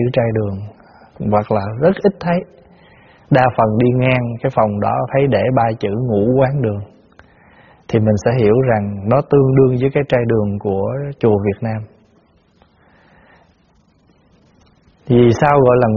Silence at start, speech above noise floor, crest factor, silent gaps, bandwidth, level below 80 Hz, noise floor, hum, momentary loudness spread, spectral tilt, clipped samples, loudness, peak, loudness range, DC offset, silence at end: 0 s; 40 dB; 16 dB; none; 7 kHz; -44 dBFS; -55 dBFS; none; 9 LU; -7.5 dB/octave; under 0.1%; -15 LUFS; 0 dBFS; 7 LU; under 0.1%; 0 s